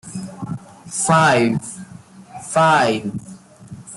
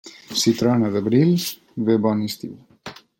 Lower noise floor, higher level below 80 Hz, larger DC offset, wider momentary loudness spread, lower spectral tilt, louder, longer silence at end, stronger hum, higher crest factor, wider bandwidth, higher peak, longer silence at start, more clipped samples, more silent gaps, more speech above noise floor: about the same, -41 dBFS vs -41 dBFS; first, -56 dBFS vs -62 dBFS; neither; about the same, 22 LU vs 20 LU; about the same, -4.5 dB/octave vs -5.5 dB/octave; first, -17 LUFS vs -20 LUFS; second, 0 s vs 0.25 s; neither; about the same, 18 dB vs 16 dB; second, 12 kHz vs 17 kHz; about the same, -2 dBFS vs -4 dBFS; about the same, 0.05 s vs 0.05 s; neither; neither; about the same, 25 dB vs 22 dB